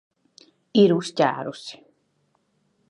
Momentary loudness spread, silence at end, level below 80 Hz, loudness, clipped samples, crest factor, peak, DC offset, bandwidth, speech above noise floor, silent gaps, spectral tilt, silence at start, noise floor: 19 LU; 1.15 s; -76 dBFS; -21 LUFS; under 0.1%; 20 dB; -4 dBFS; under 0.1%; 10.5 kHz; 48 dB; none; -6 dB/octave; 0.75 s; -69 dBFS